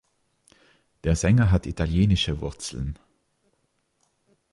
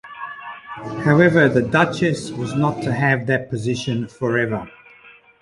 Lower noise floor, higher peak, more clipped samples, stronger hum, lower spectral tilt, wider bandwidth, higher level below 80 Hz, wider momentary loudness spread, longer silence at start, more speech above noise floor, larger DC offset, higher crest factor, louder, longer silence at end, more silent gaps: first, -72 dBFS vs -48 dBFS; second, -8 dBFS vs -2 dBFS; neither; neither; about the same, -6 dB/octave vs -6.5 dB/octave; about the same, 11.5 kHz vs 11.5 kHz; first, -36 dBFS vs -52 dBFS; second, 14 LU vs 18 LU; first, 1.05 s vs 0.05 s; first, 49 dB vs 29 dB; neither; about the same, 18 dB vs 18 dB; second, -24 LUFS vs -19 LUFS; first, 1.6 s vs 0.3 s; neither